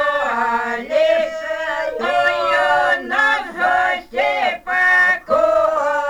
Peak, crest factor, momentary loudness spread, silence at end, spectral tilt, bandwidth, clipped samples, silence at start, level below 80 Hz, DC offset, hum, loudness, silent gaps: -2 dBFS; 14 dB; 7 LU; 0 s; -2.5 dB/octave; 19 kHz; under 0.1%; 0 s; -52 dBFS; under 0.1%; none; -17 LUFS; none